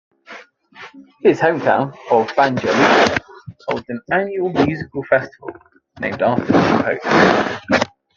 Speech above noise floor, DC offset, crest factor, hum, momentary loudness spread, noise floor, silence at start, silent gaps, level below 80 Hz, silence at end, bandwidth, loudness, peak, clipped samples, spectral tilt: 24 dB; under 0.1%; 18 dB; none; 12 LU; -41 dBFS; 0.3 s; none; -54 dBFS; 0.3 s; 7.6 kHz; -17 LUFS; 0 dBFS; under 0.1%; -5.5 dB/octave